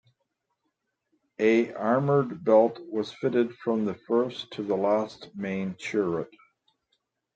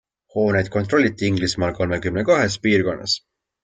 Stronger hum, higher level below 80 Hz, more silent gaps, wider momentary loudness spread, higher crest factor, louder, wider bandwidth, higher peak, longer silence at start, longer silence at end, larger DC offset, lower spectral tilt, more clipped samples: neither; second, -72 dBFS vs -50 dBFS; neither; first, 11 LU vs 5 LU; about the same, 20 dB vs 18 dB; second, -27 LUFS vs -20 LUFS; second, 8.4 kHz vs 9.4 kHz; second, -8 dBFS vs -4 dBFS; first, 1.4 s vs 0.35 s; first, 1.1 s vs 0.45 s; neither; first, -7 dB/octave vs -5 dB/octave; neither